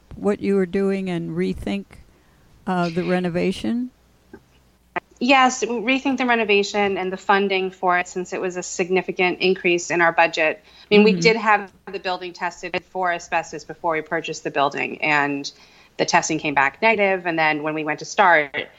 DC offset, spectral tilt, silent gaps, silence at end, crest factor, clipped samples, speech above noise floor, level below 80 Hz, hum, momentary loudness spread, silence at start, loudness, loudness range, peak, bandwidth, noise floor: under 0.1%; -4.5 dB/octave; none; 0.1 s; 18 dB; under 0.1%; 36 dB; -54 dBFS; none; 12 LU; 0.1 s; -20 LUFS; 6 LU; -2 dBFS; 11 kHz; -57 dBFS